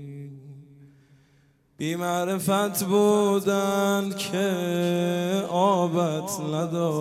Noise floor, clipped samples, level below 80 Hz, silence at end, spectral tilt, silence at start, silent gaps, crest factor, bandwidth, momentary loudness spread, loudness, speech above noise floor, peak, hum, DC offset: -61 dBFS; under 0.1%; -70 dBFS; 0 s; -5.5 dB/octave; 0 s; none; 16 dB; 16 kHz; 9 LU; -24 LUFS; 38 dB; -8 dBFS; none; under 0.1%